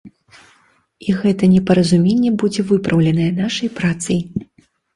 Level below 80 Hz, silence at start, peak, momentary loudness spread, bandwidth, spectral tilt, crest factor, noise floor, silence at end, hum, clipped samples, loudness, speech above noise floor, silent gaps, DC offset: -48 dBFS; 0.05 s; 0 dBFS; 8 LU; 11.5 kHz; -6.5 dB/octave; 16 dB; -56 dBFS; 0.55 s; none; under 0.1%; -16 LUFS; 41 dB; none; under 0.1%